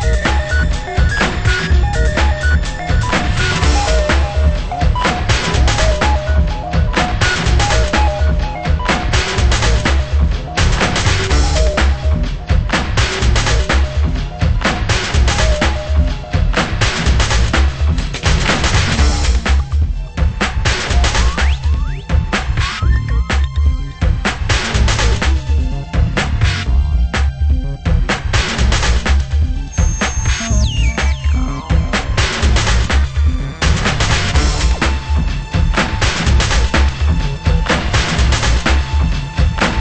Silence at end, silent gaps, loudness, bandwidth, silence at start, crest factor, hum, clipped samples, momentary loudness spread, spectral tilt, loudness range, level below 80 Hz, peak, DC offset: 0 s; none; -15 LUFS; 8.8 kHz; 0 s; 14 dB; none; under 0.1%; 4 LU; -4.5 dB/octave; 2 LU; -16 dBFS; 0 dBFS; under 0.1%